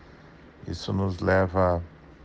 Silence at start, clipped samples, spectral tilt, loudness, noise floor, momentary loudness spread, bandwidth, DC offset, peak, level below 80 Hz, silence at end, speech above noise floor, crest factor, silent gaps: 0.25 s; under 0.1%; -7.5 dB/octave; -26 LUFS; -50 dBFS; 18 LU; 7.8 kHz; under 0.1%; -10 dBFS; -52 dBFS; 0 s; 25 dB; 18 dB; none